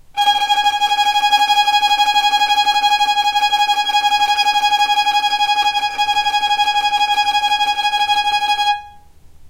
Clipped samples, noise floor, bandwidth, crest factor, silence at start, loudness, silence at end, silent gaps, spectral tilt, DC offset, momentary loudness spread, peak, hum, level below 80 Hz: under 0.1%; -41 dBFS; 16 kHz; 12 dB; 0.1 s; -14 LUFS; 0 s; none; 2 dB/octave; under 0.1%; 3 LU; -2 dBFS; none; -50 dBFS